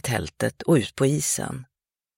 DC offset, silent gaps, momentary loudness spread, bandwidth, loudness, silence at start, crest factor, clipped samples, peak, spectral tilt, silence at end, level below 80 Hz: under 0.1%; none; 10 LU; 16.5 kHz; -24 LUFS; 0.05 s; 18 dB; under 0.1%; -8 dBFS; -4.5 dB/octave; 0.55 s; -52 dBFS